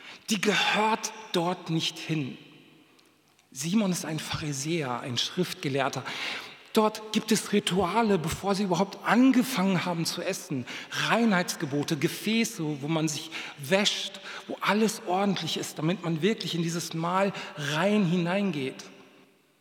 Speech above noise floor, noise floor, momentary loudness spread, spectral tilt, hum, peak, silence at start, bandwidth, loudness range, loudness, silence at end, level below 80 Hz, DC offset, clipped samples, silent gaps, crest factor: 35 dB; -63 dBFS; 10 LU; -4.5 dB/octave; none; -6 dBFS; 0 s; 18.5 kHz; 5 LU; -28 LUFS; 0.6 s; -64 dBFS; under 0.1%; under 0.1%; none; 22 dB